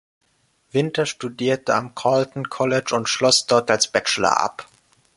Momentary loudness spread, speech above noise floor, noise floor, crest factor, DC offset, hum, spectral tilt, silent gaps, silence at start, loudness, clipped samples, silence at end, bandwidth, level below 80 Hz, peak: 9 LU; 44 dB; -64 dBFS; 20 dB; under 0.1%; none; -3 dB/octave; none; 0.75 s; -20 LUFS; under 0.1%; 0.55 s; 11.5 kHz; -60 dBFS; -2 dBFS